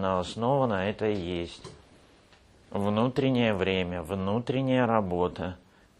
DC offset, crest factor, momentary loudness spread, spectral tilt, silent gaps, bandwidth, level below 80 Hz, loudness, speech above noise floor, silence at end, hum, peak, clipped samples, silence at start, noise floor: under 0.1%; 20 dB; 12 LU; -7 dB/octave; none; 12.5 kHz; -56 dBFS; -28 LUFS; 30 dB; 0.45 s; none; -8 dBFS; under 0.1%; 0 s; -58 dBFS